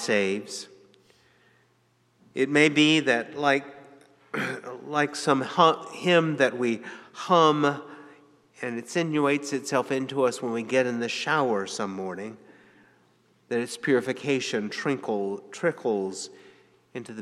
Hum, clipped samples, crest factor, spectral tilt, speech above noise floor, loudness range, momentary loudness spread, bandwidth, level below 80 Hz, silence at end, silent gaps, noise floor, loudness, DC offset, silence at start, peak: none; under 0.1%; 22 dB; -4.5 dB/octave; 41 dB; 6 LU; 17 LU; 13 kHz; -80 dBFS; 0 s; none; -66 dBFS; -25 LUFS; under 0.1%; 0 s; -4 dBFS